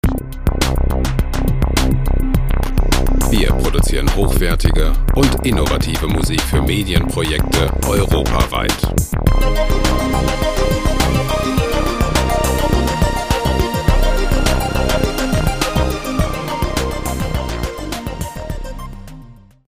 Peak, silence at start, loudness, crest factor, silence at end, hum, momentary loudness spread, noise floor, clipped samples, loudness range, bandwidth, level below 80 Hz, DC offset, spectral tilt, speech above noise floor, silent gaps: 0 dBFS; 0.05 s; -17 LUFS; 14 dB; 0.35 s; none; 6 LU; -39 dBFS; under 0.1%; 3 LU; 16 kHz; -18 dBFS; under 0.1%; -5 dB/octave; 25 dB; none